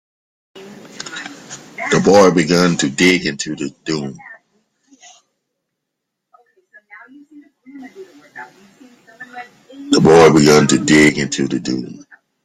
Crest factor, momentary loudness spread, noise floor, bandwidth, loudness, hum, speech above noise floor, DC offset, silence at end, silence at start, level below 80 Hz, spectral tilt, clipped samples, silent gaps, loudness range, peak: 16 dB; 26 LU; -77 dBFS; 15 kHz; -13 LUFS; none; 64 dB; under 0.1%; 0.5 s; 0.55 s; -50 dBFS; -4.5 dB/octave; under 0.1%; none; 15 LU; 0 dBFS